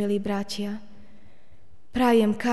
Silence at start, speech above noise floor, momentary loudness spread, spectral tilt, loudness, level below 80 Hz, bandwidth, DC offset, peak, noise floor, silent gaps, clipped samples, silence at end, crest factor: 0 s; 35 dB; 14 LU; -6 dB/octave; -25 LUFS; -52 dBFS; 12 kHz; 1%; -10 dBFS; -59 dBFS; none; under 0.1%; 0 s; 16 dB